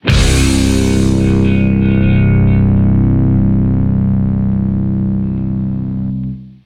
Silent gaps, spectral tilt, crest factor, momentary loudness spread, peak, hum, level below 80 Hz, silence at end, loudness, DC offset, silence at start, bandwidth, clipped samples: none; -6.5 dB/octave; 12 dB; 7 LU; 0 dBFS; none; -20 dBFS; 0.15 s; -13 LUFS; under 0.1%; 0.05 s; 14 kHz; under 0.1%